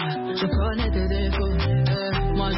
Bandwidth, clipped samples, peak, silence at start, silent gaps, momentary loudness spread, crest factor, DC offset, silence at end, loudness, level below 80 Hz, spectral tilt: 5.8 kHz; under 0.1%; -12 dBFS; 0 s; none; 3 LU; 10 dB; under 0.1%; 0 s; -24 LUFS; -26 dBFS; -10.5 dB/octave